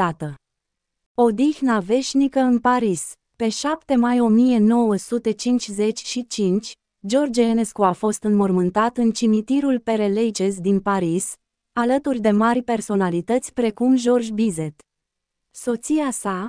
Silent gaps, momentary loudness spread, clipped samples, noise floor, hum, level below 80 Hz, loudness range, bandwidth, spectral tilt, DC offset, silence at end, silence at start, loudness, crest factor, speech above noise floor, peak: 1.06-1.15 s; 9 LU; under 0.1%; -81 dBFS; none; -56 dBFS; 2 LU; 10.5 kHz; -5.5 dB/octave; under 0.1%; 0 s; 0 s; -20 LUFS; 16 dB; 61 dB; -4 dBFS